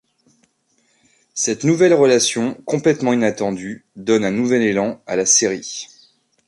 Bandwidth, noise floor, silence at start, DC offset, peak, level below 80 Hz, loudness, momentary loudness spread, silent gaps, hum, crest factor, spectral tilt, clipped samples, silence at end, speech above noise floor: 11.5 kHz; -63 dBFS; 1.35 s; under 0.1%; -2 dBFS; -60 dBFS; -17 LUFS; 15 LU; none; none; 18 dB; -3.5 dB/octave; under 0.1%; 0.65 s; 46 dB